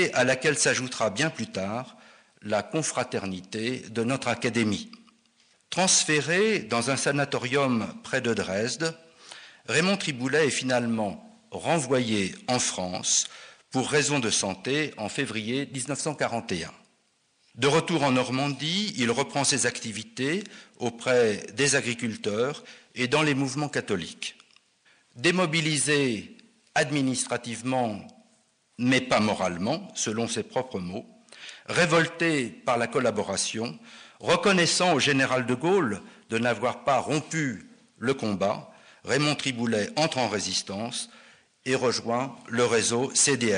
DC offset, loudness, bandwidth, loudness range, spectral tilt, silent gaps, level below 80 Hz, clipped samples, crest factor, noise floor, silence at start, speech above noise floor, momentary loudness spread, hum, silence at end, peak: under 0.1%; -26 LUFS; 10 kHz; 4 LU; -3.5 dB/octave; none; -66 dBFS; under 0.1%; 16 dB; -68 dBFS; 0 s; 42 dB; 12 LU; none; 0 s; -10 dBFS